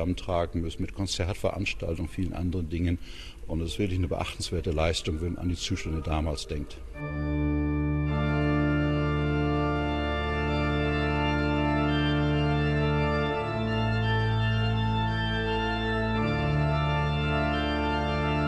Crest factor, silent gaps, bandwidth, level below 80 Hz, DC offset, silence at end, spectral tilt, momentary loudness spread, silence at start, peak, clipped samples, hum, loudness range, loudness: 14 dB; none; 12.5 kHz; -36 dBFS; under 0.1%; 0 s; -6.5 dB/octave; 7 LU; 0 s; -12 dBFS; under 0.1%; none; 5 LU; -28 LUFS